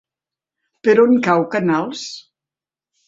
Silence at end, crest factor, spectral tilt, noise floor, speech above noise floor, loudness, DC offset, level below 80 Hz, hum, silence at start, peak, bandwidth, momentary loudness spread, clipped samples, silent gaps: 0.85 s; 18 dB; -6 dB/octave; -89 dBFS; 74 dB; -16 LUFS; under 0.1%; -62 dBFS; none; 0.85 s; -2 dBFS; 7.8 kHz; 17 LU; under 0.1%; none